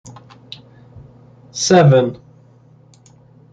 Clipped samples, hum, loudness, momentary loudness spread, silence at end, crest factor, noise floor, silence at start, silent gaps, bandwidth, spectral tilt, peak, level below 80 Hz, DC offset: under 0.1%; none; -13 LUFS; 27 LU; 1.35 s; 16 dB; -48 dBFS; 0.05 s; none; 9.2 kHz; -5.5 dB/octave; -2 dBFS; -56 dBFS; under 0.1%